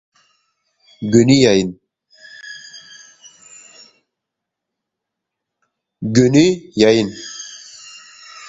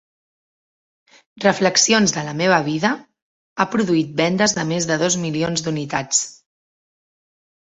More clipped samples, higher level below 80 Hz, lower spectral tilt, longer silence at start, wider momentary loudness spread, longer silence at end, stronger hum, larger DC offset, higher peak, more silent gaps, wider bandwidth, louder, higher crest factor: neither; first, -52 dBFS vs -58 dBFS; first, -5.5 dB/octave vs -3.5 dB/octave; second, 1 s vs 1.35 s; first, 25 LU vs 8 LU; second, 0.05 s vs 1.35 s; neither; neither; about the same, 0 dBFS vs -2 dBFS; second, none vs 3.22-3.56 s; about the same, 8 kHz vs 8.4 kHz; first, -14 LUFS vs -18 LUFS; about the same, 20 dB vs 20 dB